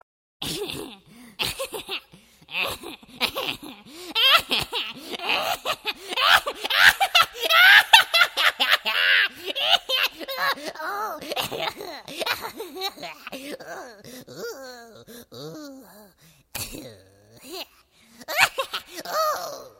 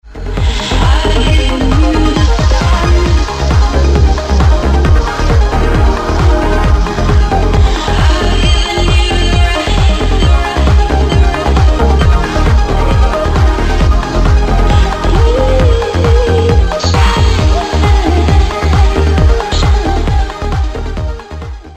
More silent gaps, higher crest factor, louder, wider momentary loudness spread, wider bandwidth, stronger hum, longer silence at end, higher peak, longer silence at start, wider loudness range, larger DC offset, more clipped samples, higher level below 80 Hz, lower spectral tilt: neither; first, 24 dB vs 8 dB; second, -21 LUFS vs -11 LUFS; first, 23 LU vs 3 LU; first, 16.5 kHz vs 9.6 kHz; neither; about the same, 0.1 s vs 0 s; about the same, 0 dBFS vs 0 dBFS; first, 0.4 s vs 0.05 s; first, 22 LU vs 1 LU; neither; neither; second, -58 dBFS vs -10 dBFS; second, -0.5 dB/octave vs -6 dB/octave